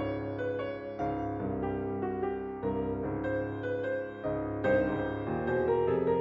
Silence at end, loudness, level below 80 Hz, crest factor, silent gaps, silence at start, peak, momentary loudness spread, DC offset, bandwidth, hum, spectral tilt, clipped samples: 0 s; -33 LUFS; -52 dBFS; 14 dB; none; 0 s; -18 dBFS; 7 LU; under 0.1%; 7 kHz; none; -9.5 dB/octave; under 0.1%